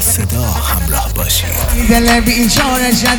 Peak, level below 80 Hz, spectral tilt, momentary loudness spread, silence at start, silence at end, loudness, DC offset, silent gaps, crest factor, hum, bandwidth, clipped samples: 0 dBFS; -18 dBFS; -3.5 dB/octave; 5 LU; 0 s; 0 s; -12 LUFS; under 0.1%; none; 12 dB; none; over 20 kHz; under 0.1%